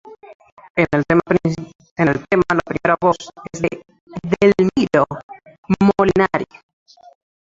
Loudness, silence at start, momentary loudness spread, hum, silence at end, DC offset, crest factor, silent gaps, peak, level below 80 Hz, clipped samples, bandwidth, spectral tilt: -17 LUFS; 0.05 s; 17 LU; none; 1.1 s; under 0.1%; 18 dB; 0.35-0.40 s, 0.52-0.57 s, 0.70-0.75 s, 1.75-1.79 s, 1.91-1.96 s, 4.01-4.07 s, 5.23-5.29 s, 5.58-5.63 s; -2 dBFS; -46 dBFS; under 0.1%; 7.8 kHz; -7 dB/octave